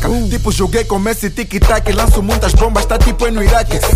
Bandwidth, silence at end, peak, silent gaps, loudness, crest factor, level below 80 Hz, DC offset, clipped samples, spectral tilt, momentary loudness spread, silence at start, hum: 16 kHz; 0 s; 0 dBFS; none; -14 LUFS; 12 dB; -14 dBFS; under 0.1%; under 0.1%; -5 dB/octave; 4 LU; 0 s; none